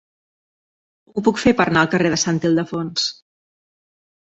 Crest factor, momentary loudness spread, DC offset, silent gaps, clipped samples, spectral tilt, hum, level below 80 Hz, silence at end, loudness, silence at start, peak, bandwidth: 20 dB; 7 LU; under 0.1%; none; under 0.1%; -4.5 dB/octave; none; -50 dBFS; 1.1 s; -18 LUFS; 1.15 s; -2 dBFS; 8.2 kHz